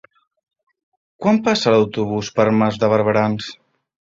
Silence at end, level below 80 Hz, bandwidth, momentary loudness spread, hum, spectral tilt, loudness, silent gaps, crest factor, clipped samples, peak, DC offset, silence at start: 0.65 s; -56 dBFS; 7.6 kHz; 7 LU; none; -6 dB/octave; -17 LUFS; none; 18 dB; under 0.1%; -2 dBFS; under 0.1%; 1.2 s